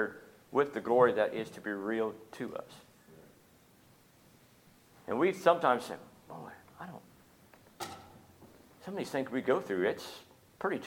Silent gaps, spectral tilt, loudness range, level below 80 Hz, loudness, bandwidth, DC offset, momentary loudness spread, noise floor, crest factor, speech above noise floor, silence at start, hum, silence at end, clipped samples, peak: none; -5.5 dB/octave; 11 LU; -76 dBFS; -32 LUFS; 18 kHz; under 0.1%; 23 LU; -63 dBFS; 26 dB; 31 dB; 0 s; none; 0 s; under 0.1%; -10 dBFS